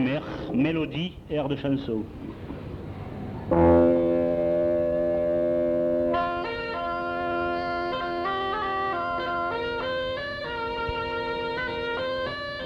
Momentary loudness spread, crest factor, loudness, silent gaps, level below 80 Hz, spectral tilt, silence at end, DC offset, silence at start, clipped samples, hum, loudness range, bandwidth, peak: 9 LU; 18 dB; -26 LUFS; none; -46 dBFS; -8 dB/octave; 0 s; under 0.1%; 0 s; under 0.1%; none; 6 LU; 6.6 kHz; -8 dBFS